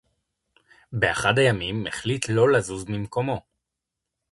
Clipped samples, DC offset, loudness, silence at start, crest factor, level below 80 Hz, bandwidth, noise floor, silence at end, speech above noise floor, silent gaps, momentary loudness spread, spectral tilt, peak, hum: under 0.1%; under 0.1%; -23 LUFS; 0.9 s; 20 dB; -52 dBFS; 11.5 kHz; -84 dBFS; 0.9 s; 61 dB; none; 11 LU; -5 dB/octave; -6 dBFS; none